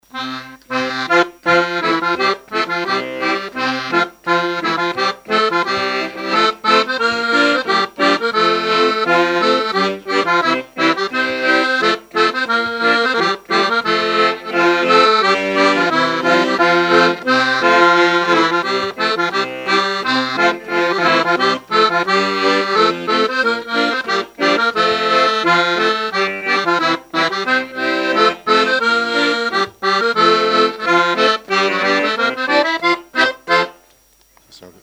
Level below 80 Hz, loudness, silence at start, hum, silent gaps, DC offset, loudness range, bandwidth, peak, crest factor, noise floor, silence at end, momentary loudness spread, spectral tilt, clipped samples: -60 dBFS; -15 LUFS; 0.15 s; none; none; under 0.1%; 4 LU; 16 kHz; -2 dBFS; 14 dB; -53 dBFS; 0.1 s; 5 LU; -3.5 dB/octave; under 0.1%